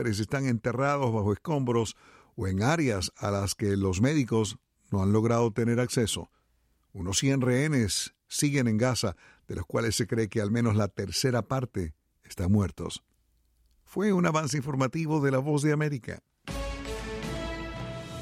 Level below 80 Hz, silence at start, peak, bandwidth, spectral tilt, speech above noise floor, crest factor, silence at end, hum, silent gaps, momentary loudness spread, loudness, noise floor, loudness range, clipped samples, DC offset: -50 dBFS; 0 s; -10 dBFS; 15.5 kHz; -5.5 dB/octave; 43 dB; 18 dB; 0 s; none; none; 12 LU; -28 LUFS; -70 dBFS; 3 LU; under 0.1%; under 0.1%